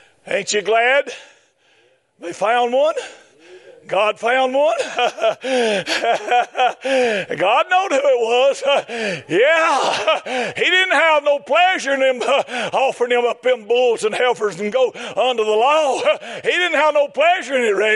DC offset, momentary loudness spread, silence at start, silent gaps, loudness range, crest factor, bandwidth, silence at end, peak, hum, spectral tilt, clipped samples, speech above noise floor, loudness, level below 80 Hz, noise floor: under 0.1%; 6 LU; 0.25 s; none; 4 LU; 16 dB; 11.5 kHz; 0 s; -2 dBFS; none; -2.5 dB/octave; under 0.1%; 40 dB; -17 LUFS; -76 dBFS; -57 dBFS